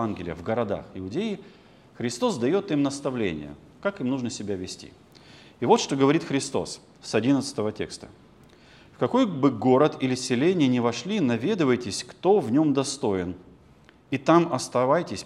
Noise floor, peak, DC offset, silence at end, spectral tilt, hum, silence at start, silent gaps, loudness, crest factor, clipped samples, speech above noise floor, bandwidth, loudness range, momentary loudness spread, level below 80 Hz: -54 dBFS; -4 dBFS; under 0.1%; 0 s; -5.5 dB/octave; none; 0 s; none; -25 LUFS; 20 dB; under 0.1%; 30 dB; 12 kHz; 5 LU; 12 LU; -62 dBFS